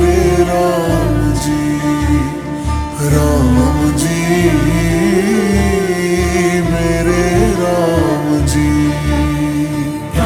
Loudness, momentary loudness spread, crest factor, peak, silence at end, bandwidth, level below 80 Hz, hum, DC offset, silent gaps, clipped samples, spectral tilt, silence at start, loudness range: -14 LUFS; 5 LU; 12 dB; 0 dBFS; 0 s; over 20 kHz; -22 dBFS; none; under 0.1%; none; under 0.1%; -6 dB/octave; 0 s; 2 LU